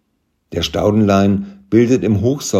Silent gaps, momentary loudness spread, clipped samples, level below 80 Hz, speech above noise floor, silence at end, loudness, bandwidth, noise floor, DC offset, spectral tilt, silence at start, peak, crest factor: none; 9 LU; under 0.1%; -44 dBFS; 52 dB; 0 s; -15 LUFS; 15.5 kHz; -66 dBFS; under 0.1%; -6 dB/octave; 0.5 s; 0 dBFS; 14 dB